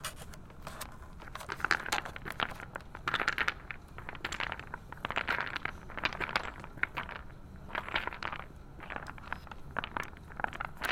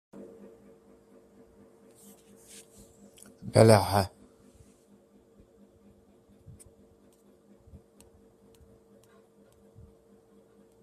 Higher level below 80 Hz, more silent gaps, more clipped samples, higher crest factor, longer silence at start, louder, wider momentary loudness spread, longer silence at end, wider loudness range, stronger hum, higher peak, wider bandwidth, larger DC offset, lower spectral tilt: first, -52 dBFS vs -62 dBFS; neither; neither; about the same, 30 dB vs 30 dB; second, 0 s vs 3.45 s; second, -37 LUFS vs -23 LUFS; second, 14 LU vs 33 LU; second, 0 s vs 6.75 s; second, 4 LU vs 9 LU; neither; second, -8 dBFS vs -4 dBFS; about the same, 16.5 kHz vs 15 kHz; neither; second, -3 dB/octave vs -6 dB/octave